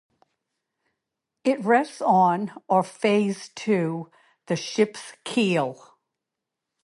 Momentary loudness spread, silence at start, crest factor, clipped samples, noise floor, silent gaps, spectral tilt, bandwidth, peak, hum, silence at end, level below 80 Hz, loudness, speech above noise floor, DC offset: 11 LU; 1.45 s; 18 dB; under 0.1%; -85 dBFS; none; -5.5 dB/octave; 11.5 kHz; -6 dBFS; none; 1.1 s; -74 dBFS; -24 LUFS; 62 dB; under 0.1%